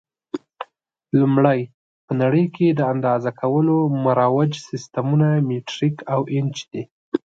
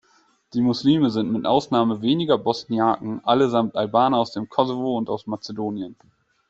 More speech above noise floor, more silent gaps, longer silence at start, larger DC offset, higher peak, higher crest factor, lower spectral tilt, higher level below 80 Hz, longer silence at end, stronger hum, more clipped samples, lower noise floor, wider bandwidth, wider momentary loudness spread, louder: second, 34 dB vs 40 dB; first, 1.74-2.08 s, 6.91-7.12 s vs none; second, 0.35 s vs 0.55 s; neither; about the same, -2 dBFS vs -4 dBFS; about the same, 18 dB vs 18 dB; about the same, -8 dB/octave vs -7 dB/octave; about the same, -66 dBFS vs -62 dBFS; second, 0.1 s vs 0.55 s; neither; neither; second, -53 dBFS vs -61 dBFS; about the same, 7.8 kHz vs 7.8 kHz; first, 16 LU vs 10 LU; about the same, -20 LUFS vs -22 LUFS